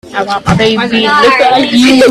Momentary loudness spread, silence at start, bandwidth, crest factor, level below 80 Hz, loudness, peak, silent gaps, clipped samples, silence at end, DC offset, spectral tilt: 6 LU; 0.05 s; 13.5 kHz; 8 dB; -36 dBFS; -8 LUFS; 0 dBFS; none; 0.2%; 0 s; under 0.1%; -4.5 dB/octave